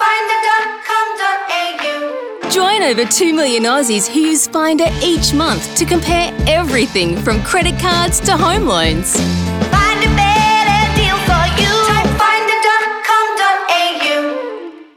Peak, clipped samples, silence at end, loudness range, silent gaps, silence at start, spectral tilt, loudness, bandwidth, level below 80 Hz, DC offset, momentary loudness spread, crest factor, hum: -2 dBFS; under 0.1%; 0.15 s; 2 LU; none; 0 s; -3.5 dB/octave; -13 LUFS; over 20 kHz; -28 dBFS; under 0.1%; 5 LU; 12 dB; none